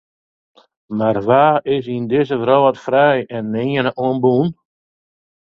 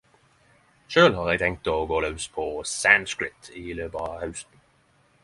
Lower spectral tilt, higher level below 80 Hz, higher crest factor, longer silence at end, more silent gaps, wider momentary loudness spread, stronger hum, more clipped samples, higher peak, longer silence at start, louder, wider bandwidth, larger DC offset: first, -8.5 dB/octave vs -3.5 dB/octave; second, -56 dBFS vs -48 dBFS; second, 16 dB vs 24 dB; first, 0.95 s vs 0.8 s; neither; second, 7 LU vs 16 LU; neither; neither; about the same, 0 dBFS vs -2 dBFS; about the same, 0.9 s vs 0.9 s; first, -16 LUFS vs -24 LUFS; second, 6.8 kHz vs 11.5 kHz; neither